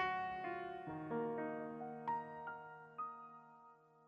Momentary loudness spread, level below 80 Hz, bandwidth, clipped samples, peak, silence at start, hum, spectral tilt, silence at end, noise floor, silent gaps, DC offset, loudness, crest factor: 16 LU; -78 dBFS; 7.2 kHz; under 0.1%; -28 dBFS; 0 s; none; -7.5 dB/octave; 0 s; -65 dBFS; none; under 0.1%; -45 LUFS; 18 dB